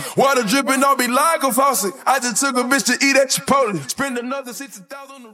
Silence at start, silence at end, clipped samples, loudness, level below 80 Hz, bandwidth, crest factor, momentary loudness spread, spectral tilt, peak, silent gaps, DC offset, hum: 0 s; 0.05 s; under 0.1%; -17 LUFS; -64 dBFS; 17.5 kHz; 16 dB; 17 LU; -2.5 dB/octave; -2 dBFS; none; under 0.1%; none